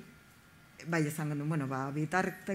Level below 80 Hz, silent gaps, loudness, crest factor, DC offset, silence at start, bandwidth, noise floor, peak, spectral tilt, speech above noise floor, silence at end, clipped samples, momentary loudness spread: -70 dBFS; none; -34 LUFS; 20 dB; under 0.1%; 0 s; 16 kHz; -59 dBFS; -14 dBFS; -6.5 dB/octave; 26 dB; 0 s; under 0.1%; 3 LU